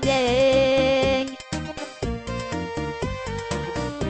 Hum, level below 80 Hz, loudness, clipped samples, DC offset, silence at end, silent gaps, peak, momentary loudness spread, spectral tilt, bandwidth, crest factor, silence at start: none; -38 dBFS; -24 LUFS; under 0.1%; under 0.1%; 0 s; none; -10 dBFS; 12 LU; -5 dB/octave; 8.8 kHz; 14 dB; 0 s